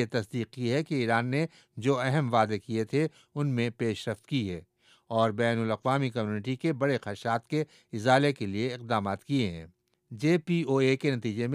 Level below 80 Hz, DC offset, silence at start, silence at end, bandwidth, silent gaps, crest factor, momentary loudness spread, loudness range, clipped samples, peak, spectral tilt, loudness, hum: -68 dBFS; under 0.1%; 0 s; 0 s; 12.5 kHz; none; 20 dB; 8 LU; 2 LU; under 0.1%; -8 dBFS; -6.5 dB/octave; -29 LUFS; none